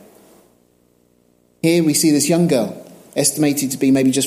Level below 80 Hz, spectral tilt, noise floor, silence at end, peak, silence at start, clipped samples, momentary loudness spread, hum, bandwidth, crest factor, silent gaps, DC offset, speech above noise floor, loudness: -62 dBFS; -4.5 dB/octave; -57 dBFS; 0 s; -2 dBFS; 1.65 s; under 0.1%; 10 LU; 60 Hz at -45 dBFS; 16 kHz; 16 dB; none; under 0.1%; 42 dB; -16 LUFS